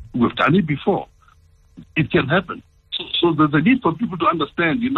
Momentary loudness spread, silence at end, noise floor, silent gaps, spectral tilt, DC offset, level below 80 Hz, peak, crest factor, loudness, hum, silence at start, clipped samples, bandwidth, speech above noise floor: 12 LU; 0 s; -52 dBFS; none; -8.5 dB/octave; under 0.1%; -48 dBFS; -4 dBFS; 16 dB; -19 LUFS; none; 0 s; under 0.1%; 5.4 kHz; 34 dB